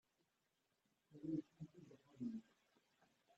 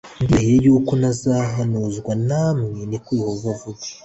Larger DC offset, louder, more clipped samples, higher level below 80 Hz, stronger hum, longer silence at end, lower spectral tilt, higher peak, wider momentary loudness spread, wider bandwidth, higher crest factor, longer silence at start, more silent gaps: neither; second, -52 LUFS vs -19 LUFS; neither; second, -88 dBFS vs -42 dBFS; neither; first, 0.95 s vs 0.1 s; first, -9 dB/octave vs -7 dB/octave; second, -36 dBFS vs -4 dBFS; first, 18 LU vs 12 LU; about the same, 8 kHz vs 8.2 kHz; first, 20 dB vs 14 dB; first, 1.1 s vs 0.05 s; neither